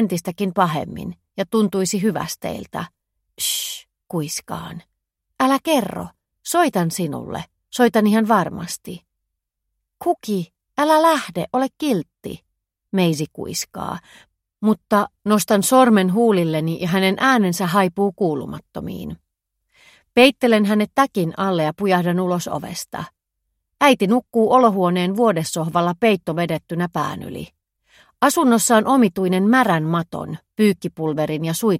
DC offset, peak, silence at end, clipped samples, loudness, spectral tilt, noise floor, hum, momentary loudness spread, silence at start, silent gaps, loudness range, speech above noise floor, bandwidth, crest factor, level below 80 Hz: under 0.1%; 0 dBFS; 0 s; under 0.1%; -19 LUFS; -5 dB/octave; -78 dBFS; none; 16 LU; 0 s; none; 6 LU; 60 dB; 16.5 kHz; 20 dB; -56 dBFS